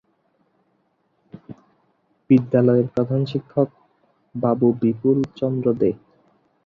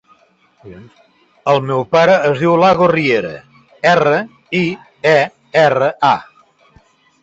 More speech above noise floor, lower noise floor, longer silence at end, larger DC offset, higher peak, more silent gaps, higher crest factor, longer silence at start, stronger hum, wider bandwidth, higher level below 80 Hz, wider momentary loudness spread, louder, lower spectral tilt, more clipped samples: first, 48 dB vs 40 dB; first, -67 dBFS vs -53 dBFS; second, 0.7 s vs 1 s; neither; second, -4 dBFS vs 0 dBFS; neither; about the same, 18 dB vs 14 dB; first, 1.5 s vs 0.65 s; neither; second, 5.8 kHz vs 8 kHz; second, -60 dBFS vs -54 dBFS; about the same, 10 LU vs 9 LU; second, -20 LUFS vs -14 LUFS; first, -10.5 dB/octave vs -6 dB/octave; neither